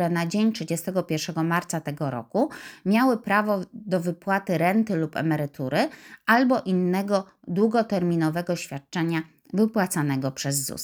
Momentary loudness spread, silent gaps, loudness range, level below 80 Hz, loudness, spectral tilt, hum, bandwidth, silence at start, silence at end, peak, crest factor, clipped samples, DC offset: 8 LU; none; 2 LU; -68 dBFS; -25 LUFS; -5.5 dB/octave; none; over 20 kHz; 0 s; 0 s; -4 dBFS; 20 dB; under 0.1%; under 0.1%